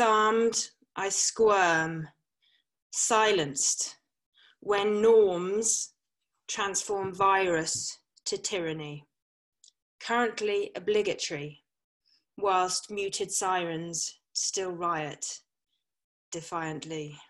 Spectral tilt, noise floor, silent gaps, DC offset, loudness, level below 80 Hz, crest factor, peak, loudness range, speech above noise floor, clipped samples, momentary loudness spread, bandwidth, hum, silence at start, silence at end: -2 dB/octave; -85 dBFS; 2.82-2.90 s, 4.26-4.32 s, 9.22-9.52 s, 9.82-9.99 s, 11.84-12.00 s, 16.04-16.32 s; under 0.1%; -28 LUFS; -70 dBFS; 20 dB; -10 dBFS; 6 LU; 56 dB; under 0.1%; 15 LU; 12.5 kHz; none; 0 s; 0.05 s